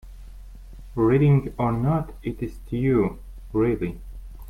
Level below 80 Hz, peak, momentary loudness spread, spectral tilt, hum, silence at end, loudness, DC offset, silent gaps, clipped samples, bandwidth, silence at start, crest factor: -40 dBFS; -10 dBFS; 16 LU; -10 dB/octave; none; 0 s; -23 LUFS; under 0.1%; none; under 0.1%; 3.9 kHz; 0.05 s; 14 dB